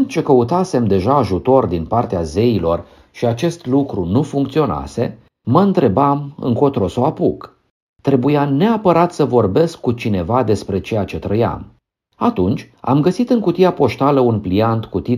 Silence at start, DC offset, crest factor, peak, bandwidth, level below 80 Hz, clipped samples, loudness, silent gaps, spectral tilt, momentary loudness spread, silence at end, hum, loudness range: 0 s; under 0.1%; 16 dB; 0 dBFS; 13.5 kHz; -42 dBFS; under 0.1%; -16 LUFS; 7.70-7.94 s; -8 dB/octave; 7 LU; 0 s; none; 3 LU